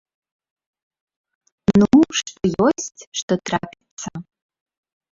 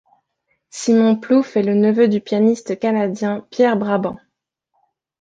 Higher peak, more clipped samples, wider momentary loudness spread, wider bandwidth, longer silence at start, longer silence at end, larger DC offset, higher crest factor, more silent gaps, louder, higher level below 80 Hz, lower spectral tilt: about the same, -2 dBFS vs -4 dBFS; neither; first, 19 LU vs 9 LU; second, 7.8 kHz vs 9.2 kHz; first, 1.7 s vs 0.75 s; second, 0.9 s vs 1.05 s; neither; first, 20 dB vs 14 dB; first, 3.07-3.12 s, 3.22-3.28 s, 3.91-3.97 s vs none; about the same, -19 LUFS vs -17 LUFS; first, -50 dBFS vs -62 dBFS; second, -5 dB/octave vs -6.5 dB/octave